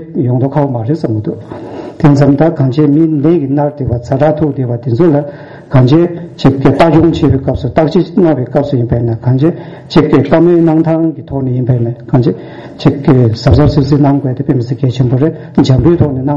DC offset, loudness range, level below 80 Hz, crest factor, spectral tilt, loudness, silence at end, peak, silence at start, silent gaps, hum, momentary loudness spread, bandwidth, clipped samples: 0.4%; 1 LU; -30 dBFS; 10 dB; -9 dB/octave; -10 LUFS; 0 s; 0 dBFS; 0 s; none; none; 8 LU; 7.4 kHz; 0.1%